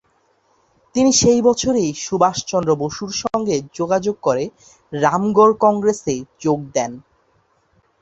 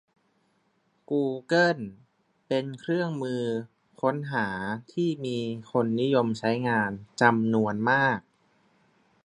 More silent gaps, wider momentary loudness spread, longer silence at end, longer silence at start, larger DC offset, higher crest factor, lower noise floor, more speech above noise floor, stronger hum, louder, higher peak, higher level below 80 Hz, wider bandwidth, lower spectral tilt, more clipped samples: neither; about the same, 10 LU vs 9 LU; about the same, 1 s vs 1.05 s; second, 0.95 s vs 1.1 s; neither; second, 18 dB vs 24 dB; second, -61 dBFS vs -70 dBFS; about the same, 43 dB vs 44 dB; neither; first, -18 LUFS vs -27 LUFS; about the same, -2 dBFS vs -4 dBFS; first, -50 dBFS vs -68 dBFS; second, 8.2 kHz vs 10.5 kHz; second, -4.5 dB/octave vs -6.5 dB/octave; neither